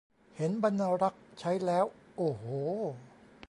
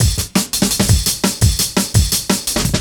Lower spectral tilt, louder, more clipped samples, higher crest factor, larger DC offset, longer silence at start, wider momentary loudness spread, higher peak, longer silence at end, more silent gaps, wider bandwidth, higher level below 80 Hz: first, -7.5 dB/octave vs -3.5 dB/octave; second, -33 LUFS vs -15 LUFS; neither; about the same, 18 dB vs 16 dB; neither; first, 0.35 s vs 0 s; first, 8 LU vs 3 LU; second, -16 dBFS vs 0 dBFS; first, 0.4 s vs 0 s; neither; second, 11.5 kHz vs over 20 kHz; second, -72 dBFS vs -24 dBFS